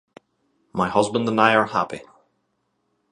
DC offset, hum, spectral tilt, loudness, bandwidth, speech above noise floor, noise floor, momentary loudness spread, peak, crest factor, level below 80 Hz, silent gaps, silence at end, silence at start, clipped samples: under 0.1%; none; -5 dB/octave; -20 LUFS; 11.5 kHz; 52 dB; -72 dBFS; 14 LU; 0 dBFS; 24 dB; -58 dBFS; none; 1.1 s; 0.75 s; under 0.1%